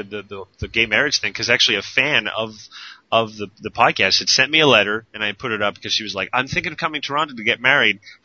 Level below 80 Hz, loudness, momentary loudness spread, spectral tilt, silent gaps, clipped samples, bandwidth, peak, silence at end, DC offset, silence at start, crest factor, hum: -50 dBFS; -17 LUFS; 16 LU; -2.5 dB/octave; none; under 0.1%; 7.6 kHz; 0 dBFS; 0.1 s; under 0.1%; 0 s; 20 dB; none